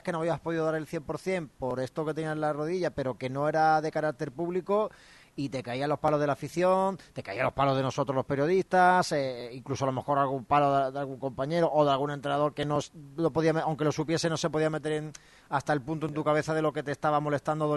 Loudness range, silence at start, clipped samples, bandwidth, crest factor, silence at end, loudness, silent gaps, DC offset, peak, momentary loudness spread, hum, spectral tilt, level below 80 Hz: 3 LU; 0.05 s; under 0.1%; 12 kHz; 18 dB; 0 s; -29 LUFS; none; under 0.1%; -12 dBFS; 10 LU; none; -6 dB/octave; -62 dBFS